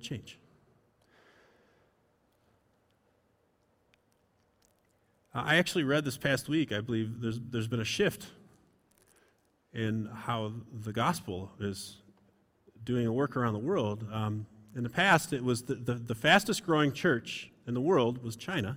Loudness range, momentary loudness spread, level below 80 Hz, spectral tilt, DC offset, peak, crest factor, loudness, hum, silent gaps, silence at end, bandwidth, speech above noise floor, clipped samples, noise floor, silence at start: 8 LU; 16 LU; -66 dBFS; -5 dB/octave; under 0.1%; -10 dBFS; 24 dB; -31 LUFS; none; none; 0 s; 16.5 kHz; 41 dB; under 0.1%; -72 dBFS; 0 s